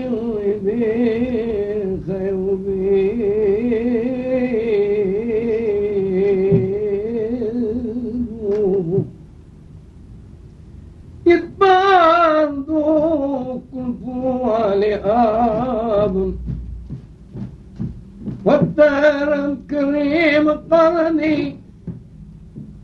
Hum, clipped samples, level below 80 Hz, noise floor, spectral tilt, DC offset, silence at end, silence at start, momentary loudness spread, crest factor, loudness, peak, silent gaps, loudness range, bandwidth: none; under 0.1%; -40 dBFS; -41 dBFS; -8 dB/octave; under 0.1%; 0 s; 0 s; 16 LU; 16 dB; -18 LUFS; -2 dBFS; none; 6 LU; 6.8 kHz